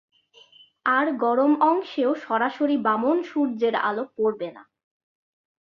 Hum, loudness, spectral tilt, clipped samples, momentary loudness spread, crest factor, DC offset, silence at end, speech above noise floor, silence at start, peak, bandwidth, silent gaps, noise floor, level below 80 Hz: none; -23 LUFS; -6.5 dB/octave; under 0.1%; 6 LU; 16 dB; under 0.1%; 1.05 s; 32 dB; 0.85 s; -8 dBFS; 6.4 kHz; none; -54 dBFS; -74 dBFS